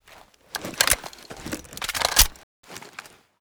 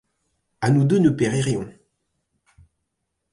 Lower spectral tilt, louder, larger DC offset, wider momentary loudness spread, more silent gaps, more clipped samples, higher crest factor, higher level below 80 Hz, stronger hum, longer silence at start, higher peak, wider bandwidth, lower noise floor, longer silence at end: second, -0.5 dB/octave vs -7 dB/octave; about the same, -22 LUFS vs -20 LUFS; neither; first, 23 LU vs 10 LU; first, 2.43-2.63 s vs none; neither; first, 28 dB vs 16 dB; first, -36 dBFS vs -56 dBFS; neither; about the same, 0.55 s vs 0.6 s; first, 0 dBFS vs -6 dBFS; first, over 20 kHz vs 11.5 kHz; second, -52 dBFS vs -77 dBFS; second, 0.45 s vs 1.65 s